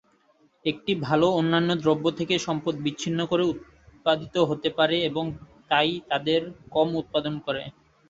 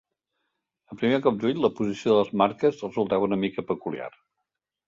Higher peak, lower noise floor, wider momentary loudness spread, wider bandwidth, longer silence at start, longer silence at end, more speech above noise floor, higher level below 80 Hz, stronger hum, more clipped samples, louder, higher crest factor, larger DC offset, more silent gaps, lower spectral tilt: about the same, -6 dBFS vs -6 dBFS; second, -63 dBFS vs -83 dBFS; about the same, 9 LU vs 8 LU; about the same, 8 kHz vs 7.6 kHz; second, 0.65 s vs 0.9 s; second, 0.4 s vs 0.8 s; second, 38 dB vs 58 dB; about the same, -60 dBFS vs -64 dBFS; neither; neither; about the same, -25 LUFS vs -25 LUFS; about the same, 20 dB vs 20 dB; neither; neither; second, -5.5 dB/octave vs -7 dB/octave